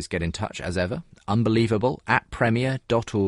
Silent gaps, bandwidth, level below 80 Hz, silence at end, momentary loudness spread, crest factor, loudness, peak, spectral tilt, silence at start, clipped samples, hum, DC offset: none; 11.5 kHz; -46 dBFS; 0 s; 8 LU; 20 dB; -24 LUFS; -4 dBFS; -6.5 dB/octave; 0 s; under 0.1%; none; under 0.1%